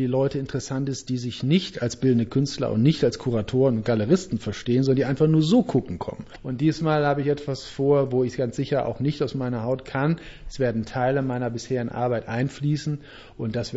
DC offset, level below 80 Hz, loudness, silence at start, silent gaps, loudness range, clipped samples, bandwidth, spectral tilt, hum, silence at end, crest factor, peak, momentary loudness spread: under 0.1%; -50 dBFS; -24 LUFS; 0 s; none; 4 LU; under 0.1%; 8 kHz; -7 dB/octave; none; 0 s; 16 dB; -8 dBFS; 9 LU